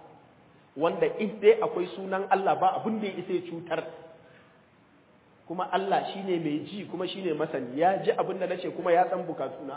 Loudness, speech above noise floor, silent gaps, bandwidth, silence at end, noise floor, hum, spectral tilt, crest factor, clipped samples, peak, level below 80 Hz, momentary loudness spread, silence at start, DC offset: -28 LUFS; 32 dB; none; 4 kHz; 0 s; -60 dBFS; none; -9.5 dB/octave; 22 dB; under 0.1%; -8 dBFS; -76 dBFS; 10 LU; 0.05 s; under 0.1%